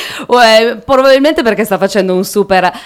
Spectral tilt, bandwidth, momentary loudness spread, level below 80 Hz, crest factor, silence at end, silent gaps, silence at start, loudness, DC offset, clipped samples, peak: -4 dB/octave; 18.5 kHz; 6 LU; -42 dBFS; 10 dB; 0 s; none; 0 s; -9 LUFS; under 0.1%; 0.8%; 0 dBFS